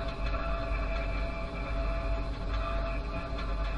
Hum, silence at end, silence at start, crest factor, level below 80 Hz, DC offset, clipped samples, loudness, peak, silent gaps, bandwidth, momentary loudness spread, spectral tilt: none; 0 s; 0 s; 12 dB; -34 dBFS; under 0.1%; under 0.1%; -35 LUFS; -20 dBFS; none; 6.8 kHz; 3 LU; -7 dB/octave